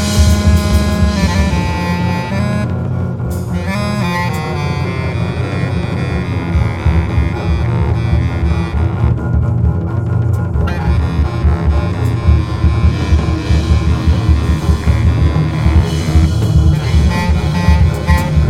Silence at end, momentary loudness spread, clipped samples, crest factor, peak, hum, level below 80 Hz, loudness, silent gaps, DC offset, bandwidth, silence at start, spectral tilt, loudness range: 0 s; 6 LU; under 0.1%; 12 dB; 0 dBFS; none; -18 dBFS; -14 LUFS; none; under 0.1%; 13.5 kHz; 0 s; -7 dB/octave; 4 LU